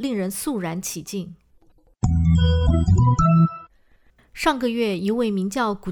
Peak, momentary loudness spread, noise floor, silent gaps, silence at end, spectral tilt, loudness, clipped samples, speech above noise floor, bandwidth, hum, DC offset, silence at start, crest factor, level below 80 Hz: -8 dBFS; 12 LU; -57 dBFS; none; 0 s; -6.5 dB/octave; -21 LUFS; under 0.1%; 35 dB; 18.5 kHz; none; under 0.1%; 0 s; 14 dB; -32 dBFS